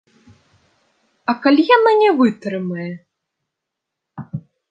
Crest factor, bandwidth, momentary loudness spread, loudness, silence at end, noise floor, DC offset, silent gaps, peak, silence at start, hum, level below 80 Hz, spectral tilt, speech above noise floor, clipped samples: 18 dB; 7.6 kHz; 20 LU; -16 LUFS; 0.3 s; -81 dBFS; under 0.1%; none; -2 dBFS; 1.3 s; none; -66 dBFS; -7.5 dB/octave; 66 dB; under 0.1%